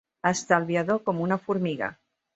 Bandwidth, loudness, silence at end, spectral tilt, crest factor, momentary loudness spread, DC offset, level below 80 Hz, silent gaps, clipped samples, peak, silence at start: 8.2 kHz; -26 LUFS; 0.4 s; -5.5 dB/octave; 22 dB; 7 LU; under 0.1%; -66 dBFS; none; under 0.1%; -6 dBFS; 0.25 s